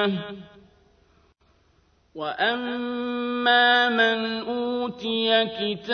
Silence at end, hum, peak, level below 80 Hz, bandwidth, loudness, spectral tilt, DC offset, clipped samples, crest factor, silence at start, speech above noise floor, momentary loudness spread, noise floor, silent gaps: 0 s; none; -8 dBFS; -64 dBFS; 6.6 kHz; -23 LUFS; -5.5 dB/octave; under 0.1%; under 0.1%; 18 dB; 0 s; 39 dB; 14 LU; -63 dBFS; none